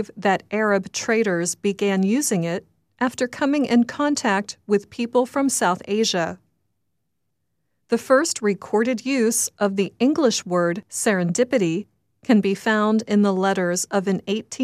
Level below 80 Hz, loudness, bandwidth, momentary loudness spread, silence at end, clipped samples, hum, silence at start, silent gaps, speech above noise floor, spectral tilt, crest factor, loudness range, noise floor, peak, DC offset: -66 dBFS; -21 LUFS; 15 kHz; 6 LU; 0 s; under 0.1%; none; 0 s; none; 56 dB; -4.5 dB/octave; 18 dB; 3 LU; -77 dBFS; -4 dBFS; under 0.1%